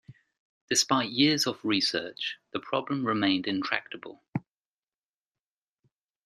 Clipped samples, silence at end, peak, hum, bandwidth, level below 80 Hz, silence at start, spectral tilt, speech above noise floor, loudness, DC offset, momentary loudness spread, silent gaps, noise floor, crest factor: under 0.1%; 1.85 s; -8 dBFS; none; 14.5 kHz; -74 dBFS; 0.1 s; -3 dB/octave; over 62 dB; -28 LUFS; under 0.1%; 14 LU; 0.39-0.68 s, 4.28-4.33 s; under -90 dBFS; 24 dB